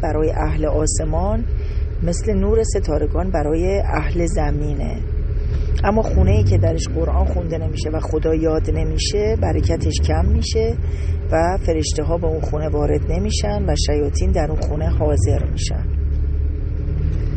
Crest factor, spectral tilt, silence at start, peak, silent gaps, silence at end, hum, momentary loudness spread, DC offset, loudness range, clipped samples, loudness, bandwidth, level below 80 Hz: 14 dB; -6 dB/octave; 0 s; -2 dBFS; none; 0 s; none; 5 LU; under 0.1%; 1 LU; under 0.1%; -20 LUFS; 8.8 kHz; -20 dBFS